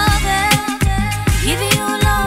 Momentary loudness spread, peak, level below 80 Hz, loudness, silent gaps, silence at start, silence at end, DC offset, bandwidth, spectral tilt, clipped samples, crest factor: 4 LU; 0 dBFS; -22 dBFS; -16 LUFS; none; 0 s; 0 s; under 0.1%; 16.5 kHz; -4 dB/octave; under 0.1%; 16 dB